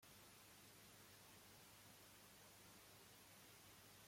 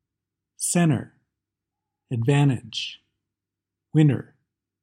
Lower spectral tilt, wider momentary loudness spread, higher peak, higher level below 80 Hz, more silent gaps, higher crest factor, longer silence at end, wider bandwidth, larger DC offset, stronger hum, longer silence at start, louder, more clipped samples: second, -2.5 dB/octave vs -5.5 dB/octave; second, 0 LU vs 12 LU; second, -52 dBFS vs -6 dBFS; second, -86 dBFS vs -64 dBFS; neither; about the same, 14 dB vs 18 dB; second, 0 s vs 0.6 s; first, 16.5 kHz vs 14 kHz; neither; first, 50 Hz at -75 dBFS vs none; second, 0 s vs 0.6 s; second, -64 LUFS vs -23 LUFS; neither